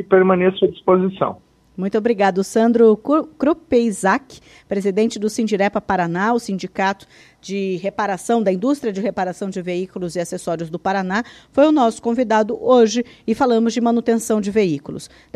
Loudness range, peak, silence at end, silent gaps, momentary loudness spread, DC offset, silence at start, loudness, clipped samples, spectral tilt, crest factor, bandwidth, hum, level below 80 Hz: 5 LU; 0 dBFS; 0.3 s; none; 11 LU; under 0.1%; 0 s; -18 LUFS; under 0.1%; -5.5 dB/octave; 18 dB; 13.5 kHz; none; -54 dBFS